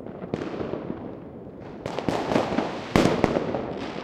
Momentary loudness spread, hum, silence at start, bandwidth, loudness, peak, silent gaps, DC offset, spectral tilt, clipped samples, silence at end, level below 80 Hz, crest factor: 17 LU; none; 0 s; 16.5 kHz; -27 LUFS; -2 dBFS; none; under 0.1%; -6 dB/octave; under 0.1%; 0 s; -50 dBFS; 24 dB